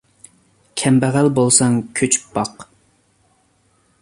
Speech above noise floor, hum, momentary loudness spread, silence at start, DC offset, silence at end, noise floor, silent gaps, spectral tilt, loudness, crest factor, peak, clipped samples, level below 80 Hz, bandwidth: 44 dB; none; 11 LU; 0.75 s; under 0.1%; 1.4 s; -60 dBFS; none; -4.5 dB/octave; -16 LUFS; 20 dB; 0 dBFS; under 0.1%; -56 dBFS; 11.5 kHz